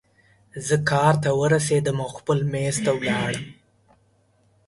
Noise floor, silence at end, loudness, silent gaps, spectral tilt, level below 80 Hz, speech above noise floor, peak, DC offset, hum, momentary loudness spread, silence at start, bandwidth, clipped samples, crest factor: -62 dBFS; 1.15 s; -22 LUFS; none; -5 dB/octave; -56 dBFS; 40 dB; -6 dBFS; under 0.1%; none; 12 LU; 0.55 s; 11.5 kHz; under 0.1%; 18 dB